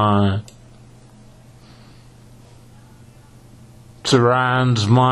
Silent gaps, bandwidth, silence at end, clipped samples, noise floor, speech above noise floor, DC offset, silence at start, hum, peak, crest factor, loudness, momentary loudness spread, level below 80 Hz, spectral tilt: none; 11.5 kHz; 0 s; under 0.1%; -45 dBFS; 30 dB; under 0.1%; 0 s; none; -2 dBFS; 20 dB; -17 LUFS; 10 LU; -52 dBFS; -6 dB/octave